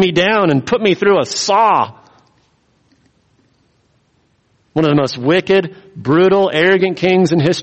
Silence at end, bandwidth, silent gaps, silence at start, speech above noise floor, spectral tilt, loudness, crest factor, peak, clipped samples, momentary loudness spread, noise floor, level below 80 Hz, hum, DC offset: 0 s; 8.4 kHz; none; 0 s; 46 dB; -5.5 dB/octave; -13 LUFS; 14 dB; 0 dBFS; under 0.1%; 5 LU; -59 dBFS; -54 dBFS; none; under 0.1%